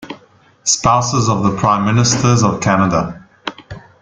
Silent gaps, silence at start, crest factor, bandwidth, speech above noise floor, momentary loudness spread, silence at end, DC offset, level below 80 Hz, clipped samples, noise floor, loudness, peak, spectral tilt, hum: none; 0 s; 16 dB; 9.6 kHz; 35 dB; 16 LU; 0.25 s; under 0.1%; -42 dBFS; under 0.1%; -48 dBFS; -14 LUFS; 0 dBFS; -4.5 dB/octave; none